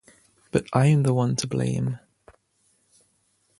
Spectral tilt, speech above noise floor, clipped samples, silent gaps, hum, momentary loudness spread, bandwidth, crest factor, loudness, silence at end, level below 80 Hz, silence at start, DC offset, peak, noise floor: -6.5 dB/octave; 46 dB; under 0.1%; none; none; 10 LU; 11.5 kHz; 22 dB; -23 LUFS; 1.65 s; -56 dBFS; 0.55 s; under 0.1%; -4 dBFS; -68 dBFS